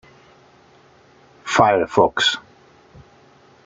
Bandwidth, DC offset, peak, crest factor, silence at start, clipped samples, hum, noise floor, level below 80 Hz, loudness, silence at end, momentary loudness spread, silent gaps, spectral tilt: 9.6 kHz; under 0.1%; -2 dBFS; 22 dB; 1.45 s; under 0.1%; none; -51 dBFS; -56 dBFS; -17 LUFS; 1.25 s; 12 LU; none; -3.5 dB/octave